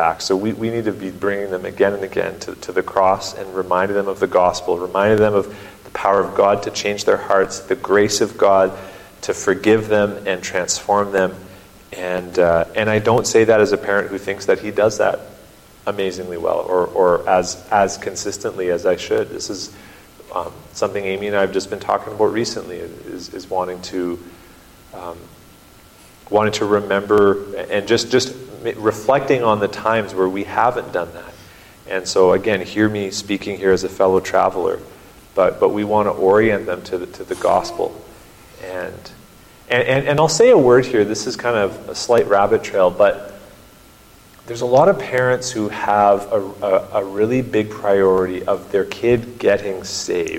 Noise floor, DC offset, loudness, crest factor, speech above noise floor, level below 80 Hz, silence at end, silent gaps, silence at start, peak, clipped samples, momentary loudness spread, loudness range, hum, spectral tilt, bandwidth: -46 dBFS; under 0.1%; -18 LUFS; 16 dB; 28 dB; -50 dBFS; 0 s; none; 0 s; -2 dBFS; under 0.1%; 13 LU; 6 LU; none; -4.5 dB/octave; 16.5 kHz